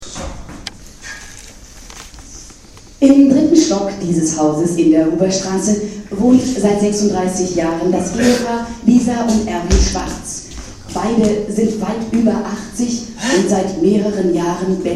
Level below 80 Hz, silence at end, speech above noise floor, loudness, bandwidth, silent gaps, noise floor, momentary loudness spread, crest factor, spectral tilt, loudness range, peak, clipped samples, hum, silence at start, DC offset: -30 dBFS; 0 s; 25 dB; -15 LUFS; 13.5 kHz; none; -39 dBFS; 19 LU; 16 dB; -5 dB/octave; 4 LU; 0 dBFS; under 0.1%; none; 0 s; under 0.1%